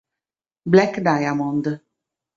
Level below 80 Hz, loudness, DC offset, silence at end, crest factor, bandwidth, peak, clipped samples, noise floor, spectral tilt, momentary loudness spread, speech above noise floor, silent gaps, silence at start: -60 dBFS; -19 LUFS; under 0.1%; 0.6 s; 20 dB; 7.4 kHz; -2 dBFS; under 0.1%; under -90 dBFS; -7 dB/octave; 15 LU; over 72 dB; none; 0.65 s